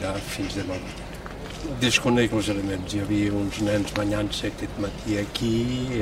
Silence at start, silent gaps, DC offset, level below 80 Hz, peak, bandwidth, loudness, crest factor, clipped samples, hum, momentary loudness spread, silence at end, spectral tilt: 0 s; none; under 0.1%; -40 dBFS; -4 dBFS; 16 kHz; -25 LUFS; 22 dB; under 0.1%; none; 12 LU; 0 s; -5 dB/octave